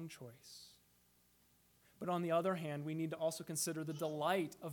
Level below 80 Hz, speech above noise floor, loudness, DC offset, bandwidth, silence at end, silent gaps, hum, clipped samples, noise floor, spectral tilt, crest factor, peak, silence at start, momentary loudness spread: -82 dBFS; 32 dB; -40 LUFS; under 0.1%; 19 kHz; 0 s; none; 60 Hz at -70 dBFS; under 0.1%; -73 dBFS; -4.5 dB/octave; 18 dB; -24 dBFS; 0 s; 19 LU